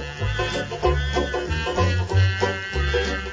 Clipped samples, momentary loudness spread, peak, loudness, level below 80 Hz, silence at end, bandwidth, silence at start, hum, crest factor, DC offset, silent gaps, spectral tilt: under 0.1%; 4 LU; -6 dBFS; -23 LUFS; -28 dBFS; 0 s; 7.8 kHz; 0 s; none; 16 dB; under 0.1%; none; -5.5 dB/octave